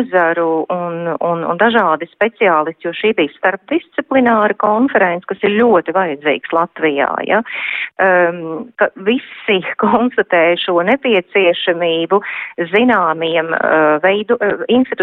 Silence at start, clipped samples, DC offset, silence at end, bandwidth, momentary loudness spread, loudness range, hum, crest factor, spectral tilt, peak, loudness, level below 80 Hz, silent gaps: 0 s; under 0.1%; under 0.1%; 0 s; 4.2 kHz; 7 LU; 2 LU; none; 14 dB; -8 dB/octave; -2 dBFS; -14 LUFS; -60 dBFS; none